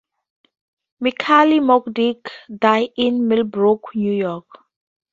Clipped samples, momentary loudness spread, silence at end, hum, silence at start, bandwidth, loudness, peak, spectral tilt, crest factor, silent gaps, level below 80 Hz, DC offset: under 0.1%; 11 LU; 0.7 s; none; 1 s; 7.6 kHz; -17 LUFS; 0 dBFS; -6.5 dB/octave; 18 dB; none; -62 dBFS; under 0.1%